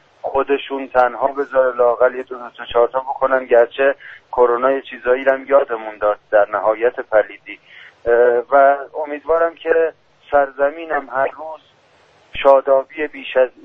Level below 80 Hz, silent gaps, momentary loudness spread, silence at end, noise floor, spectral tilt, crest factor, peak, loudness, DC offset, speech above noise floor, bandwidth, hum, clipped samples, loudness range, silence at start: -52 dBFS; none; 12 LU; 0.15 s; -53 dBFS; -6 dB/octave; 16 dB; 0 dBFS; -17 LUFS; under 0.1%; 36 dB; 4 kHz; none; under 0.1%; 2 LU; 0.25 s